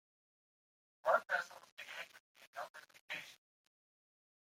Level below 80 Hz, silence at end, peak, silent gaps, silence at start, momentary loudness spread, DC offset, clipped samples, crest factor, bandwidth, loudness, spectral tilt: under -90 dBFS; 1.2 s; -20 dBFS; 1.72-1.77 s, 2.20-2.35 s, 2.47-2.53 s, 2.70-2.74 s, 3.01-3.08 s; 1.05 s; 20 LU; under 0.1%; under 0.1%; 26 dB; 16 kHz; -41 LUFS; -1 dB/octave